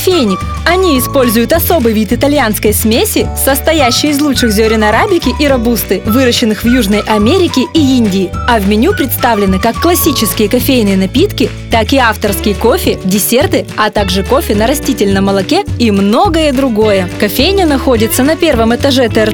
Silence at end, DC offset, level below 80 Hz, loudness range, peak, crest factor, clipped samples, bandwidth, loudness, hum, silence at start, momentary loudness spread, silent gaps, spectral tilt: 0 s; under 0.1%; -24 dBFS; 1 LU; 0 dBFS; 10 dB; under 0.1%; over 20 kHz; -10 LUFS; none; 0 s; 3 LU; none; -4.5 dB/octave